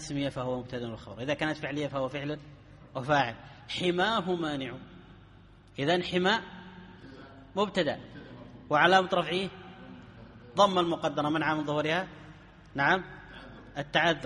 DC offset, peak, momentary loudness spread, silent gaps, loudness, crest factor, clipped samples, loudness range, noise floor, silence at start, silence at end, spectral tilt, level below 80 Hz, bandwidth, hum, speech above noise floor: under 0.1%; -8 dBFS; 23 LU; none; -29 LUFS; 24 dB; under 0.1%; 5 LU; -55 dBFS; 0 s; 0 s; -5 dB/octave; -60 dBFS; 11 kHz; none; 26 dB